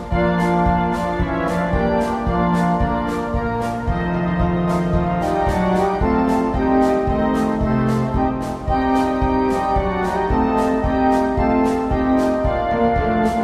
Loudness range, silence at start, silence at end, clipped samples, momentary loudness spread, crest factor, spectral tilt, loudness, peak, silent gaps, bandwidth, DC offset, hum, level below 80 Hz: 2 LU; 0 s; 0 s; under 0.1%; 4 LU; 14 dB; -7.5 dB/octave; -19 LUFS; -4 dBFS; none; 13.5 kHz; under 0.1%; none; -28 dBFS